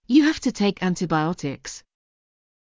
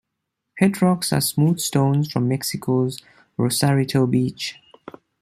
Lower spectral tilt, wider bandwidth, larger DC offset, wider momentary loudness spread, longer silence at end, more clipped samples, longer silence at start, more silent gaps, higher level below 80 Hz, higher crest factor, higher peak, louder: about the same, -5.5 dB/octave vs -5.5 dB/octave; second, 7.6 kHz vs 15.5 kHz; neither; first, 17 LU vs 8 LU; first, 0.85 s vs 0.7 s; neither; second, 0.1 s vs 0.55 s; neither; about the same, -54 dBFS vs -58 dBFS; about the same, 18 dB vs 18 dB; second, -6 dBFS vs -2 dBFS; about the same, -23 LUFS vs -21 LUFS